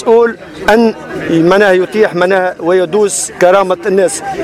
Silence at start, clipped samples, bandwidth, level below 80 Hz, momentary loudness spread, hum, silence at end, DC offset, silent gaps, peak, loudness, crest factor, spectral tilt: 0 s; 0.2%; 15.5 kHz; -44 dBFS; 6 LU; none; 0 s; under 0.1%; none; 0 dBFS; -11 LUFS; 10 dB; -4.5 dB/octave